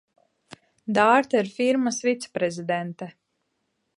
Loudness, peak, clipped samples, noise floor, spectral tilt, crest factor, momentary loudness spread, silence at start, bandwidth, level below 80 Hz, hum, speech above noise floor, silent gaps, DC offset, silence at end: -23 LUFS; -6 dBFS; under 0.1%; -75 dBFS; -4.5 dB/octave; 20 dB; 18 LU; 0.85 s; 11.5 kHz; -74 dBFS; none; 52 dB; none; under 0.1%; 0.9 s